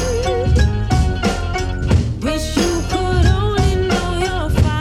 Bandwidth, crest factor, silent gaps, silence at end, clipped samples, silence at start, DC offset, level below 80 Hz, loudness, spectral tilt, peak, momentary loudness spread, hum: 14 kHz; 16 dB; none; 0 s; under 0.1%; 0 s; under 0.1%; -20 dBFS; -17 LUFS; -6 dB/octave; 0 dBFS; 5 LU; none